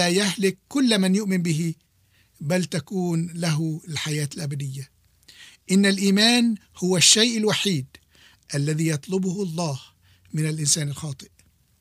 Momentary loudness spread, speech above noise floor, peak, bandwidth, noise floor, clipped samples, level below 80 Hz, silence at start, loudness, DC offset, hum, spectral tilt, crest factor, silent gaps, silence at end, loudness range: 16 LU; 39 dB; -4 dBFS; 15.5 kHz; -62 dBFS; under 0.1%; -64 dBFS; 0 s; -22 LUFS; under 0.1%; none; -4 dB/octave; 20 dB; none; 0.55 s; 8 LU